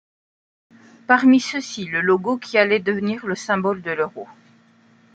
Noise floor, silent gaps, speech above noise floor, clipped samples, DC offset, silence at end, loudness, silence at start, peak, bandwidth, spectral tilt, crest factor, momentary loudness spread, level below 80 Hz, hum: -54 dBFS; none; 35 dB; under 0.1%; under 0.1%; 0.9 s; -20 LUFS; 1.1 s; -2 dBFS; 8.8 kHz; -5 dB/octave; 20 dB; 11 LU; -68 dBFS; none